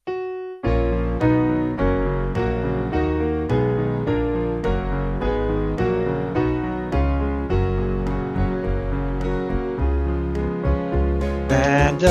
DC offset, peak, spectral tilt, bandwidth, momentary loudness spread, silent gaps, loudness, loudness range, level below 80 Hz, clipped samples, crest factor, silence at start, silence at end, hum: under 0.1%; -4 dBFS; -7.5 dB/octave; 7.8 kHz; 5 LU; none; -22 LUFS; 2 LU; -26 dBFS; under 0.1%; 18 dB; 0.05 s; 0 s; none